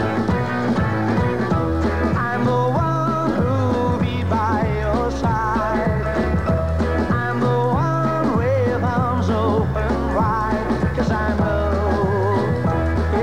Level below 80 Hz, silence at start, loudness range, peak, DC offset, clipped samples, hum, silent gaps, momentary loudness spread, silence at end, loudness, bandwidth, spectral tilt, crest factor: -30 dBFS; 0 s; 1 LU; -6 dBFS; 1%; under 0.1%; none; none; 2 LU; 0 s; -20 LUFS; 10.5 kHz; -8 dB/octave; 12 dB